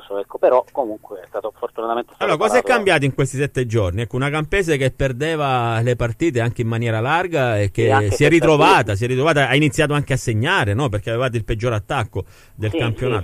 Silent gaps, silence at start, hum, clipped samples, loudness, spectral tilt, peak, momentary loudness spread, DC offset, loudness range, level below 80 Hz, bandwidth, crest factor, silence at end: none; 0 s; none; under 0.1%; -18 LUFS; -6 dB/octave; -2 dBFS; 10 LU; under 0.1%; 4 LU; -40 dBFS; 15 kHz; 16 dB; 0 s